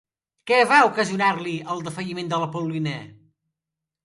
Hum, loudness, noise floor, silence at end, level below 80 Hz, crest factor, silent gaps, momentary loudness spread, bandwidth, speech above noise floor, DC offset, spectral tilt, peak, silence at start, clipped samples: none; -22 LUFS; -86 dBFS; 0.9 s; -68 dBFS; 20 dB; none; 14 LU; 11.5 kHz; 64 dB; under 0.1%; -5 dB/octave; -4 dBFS; 0.45 s; under 0.1%